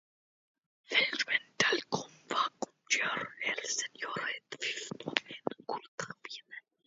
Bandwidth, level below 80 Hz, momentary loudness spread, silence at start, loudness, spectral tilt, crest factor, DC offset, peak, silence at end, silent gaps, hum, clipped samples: 7.6 kHz; -82 dBFS; 13 LU; 0.9 s; -33 LUFS; 0 dB/octave; 30 dB; under 0.1%; -6 dBFS; 0.25 s; 5.88-5.98 s; none; under 0.1%